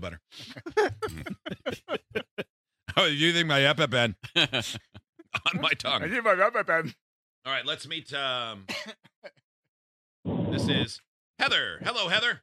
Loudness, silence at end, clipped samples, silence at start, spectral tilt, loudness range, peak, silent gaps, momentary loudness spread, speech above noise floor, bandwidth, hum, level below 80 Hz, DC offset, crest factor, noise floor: -27 LUFS; 0.05 s; under 0.1%; 0 s; -4 dB/octave; 8 LU; -6 dBFS; 2.31-2.37 s, 2.50-2.64 s, 5.09-5.13 s, 7.01-7.42 s, 9.16-9.22 s, 9.44-10.23 s, 11.07-11.34 s; 18 LU; over 63 dB; 15.5 kHz; none; -60 dBFS; under 0.1%; 22 dB; under -90 dBFS